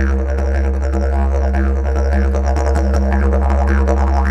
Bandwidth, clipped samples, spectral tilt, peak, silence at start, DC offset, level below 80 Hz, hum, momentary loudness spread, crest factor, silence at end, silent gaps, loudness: 7.8 kHz; under 0.1%; -8 dB/octave; -2 dBFS; 0 s; under 0.1%; -14 dBFS; none; 3 LU; 12 dB; 0 s; none; -16 LUFS